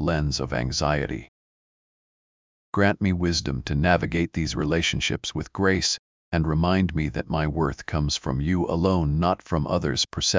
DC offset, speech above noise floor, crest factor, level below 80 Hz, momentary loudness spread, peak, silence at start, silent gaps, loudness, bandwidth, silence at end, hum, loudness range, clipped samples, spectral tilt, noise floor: under 0.1%; over 66 dB; 18 dB; -36 dBFS; 6 LU; -6 dBFS; 0 s; 1.28-2.73 s, 5.99-6.32 s; -24 LUFS; 7.6 kHz; 0 s; none; 3 LU; under 0.1%; -5 dB/octave; under -90 dBFS